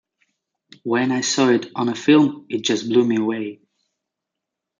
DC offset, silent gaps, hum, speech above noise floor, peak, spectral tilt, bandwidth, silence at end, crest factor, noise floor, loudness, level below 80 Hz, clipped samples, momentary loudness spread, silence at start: under 0.1%; none; none; 64 dB; -2 dBFS; -4.5 dB/octave; 9.4 kHz; 1.25 s; 18 dB; -83 dBFS; -19 LUFS; -70 dBFS; under 0.1%; 9 LU; 0.85 s